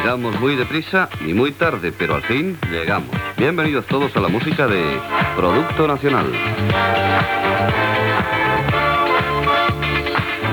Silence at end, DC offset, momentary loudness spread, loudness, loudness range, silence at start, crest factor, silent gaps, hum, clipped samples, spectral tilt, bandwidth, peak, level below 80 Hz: 0 s; under 0.1%; 4 LU; -18 LUFS; 2 LU; 0 s; 14 dB; none; none; under 0.1%; -6.5 dB/octave; over 20 kHz; -4 dBFS; -40 dBFS